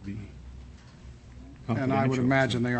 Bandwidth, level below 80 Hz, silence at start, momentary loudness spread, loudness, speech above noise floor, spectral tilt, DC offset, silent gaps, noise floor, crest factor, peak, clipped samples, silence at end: 8.6 kHz; -50 dBFS; 0 s; 25 LU; -26 LUFS; 23 dB; -7 dB/octave; under 0.1%; none; -48 dBFS; 20 dB; -10 dBFS; under 0.1%; 0 s